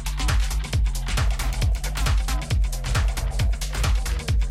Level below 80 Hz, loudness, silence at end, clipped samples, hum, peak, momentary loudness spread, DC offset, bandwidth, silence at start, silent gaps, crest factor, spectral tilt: -24 dBFS; -25 LUFS; 0 s; under 0.1%; none; -10 dBFS; 1 LU; under 0.1%; 15 kHz; 0 s; none; 12 dB; -4 dB/octave